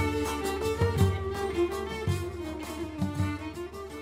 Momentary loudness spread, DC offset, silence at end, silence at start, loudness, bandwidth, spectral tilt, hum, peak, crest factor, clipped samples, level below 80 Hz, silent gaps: 10 LU; under 0.1%; 0 s; 0 s; -31 LUFS; 16 kHz; -6 dB/octave; none; -12 dBFS; 18 dB; under 0.1%; -44 dBFS; none